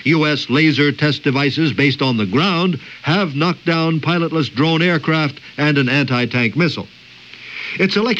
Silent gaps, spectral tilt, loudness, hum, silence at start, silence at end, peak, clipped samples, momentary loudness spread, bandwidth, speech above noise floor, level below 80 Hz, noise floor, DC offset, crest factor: none; -6.5 dB/octave; -16 LUFS; none; 0 s; 0 s; -2 dBFS; under 0.1%; 7 LU; 7.8 kHz; 23 dB; -58 dBFS; -39 dBFS; under 0.1%; 14 dB